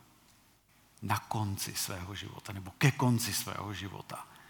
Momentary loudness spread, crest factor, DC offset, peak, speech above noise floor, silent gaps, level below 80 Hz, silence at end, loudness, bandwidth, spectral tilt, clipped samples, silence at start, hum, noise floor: 15 LU; 26 dB; under 0.1%; -10 dBFS; 31 dB; none; -70 dBFS; 0 s; -34 LUFS; 19.5 kHz; -4.5 dB/octave; under 0.1%; 1 s; none; -65 dBFS